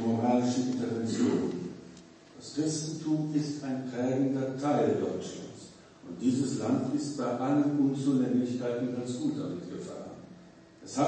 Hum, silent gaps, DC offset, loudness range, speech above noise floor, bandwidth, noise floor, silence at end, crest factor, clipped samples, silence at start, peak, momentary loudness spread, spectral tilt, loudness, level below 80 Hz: none; none; under 0.1%; 3 LU; 23 dB; 8.8 kHz; -53 dBFS; 0 s; 16 dB; under 0.1%; 0 s; -14 dBFS; 19 LU; -6.5 dB/octave; -31 LUFS; -72 dBFS